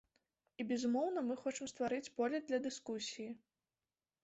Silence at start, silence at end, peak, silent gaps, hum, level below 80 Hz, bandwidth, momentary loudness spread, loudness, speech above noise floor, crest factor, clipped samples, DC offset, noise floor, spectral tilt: 0.6 s; 0.85 s; -26 dBFS; none; none; -82 dBFS; 8 kHz; 11 LU; -40 LUFS; over 50 dB; 16 dB; under 0.1%; under 0.1%; under -90 dBFS; -3 dB/octave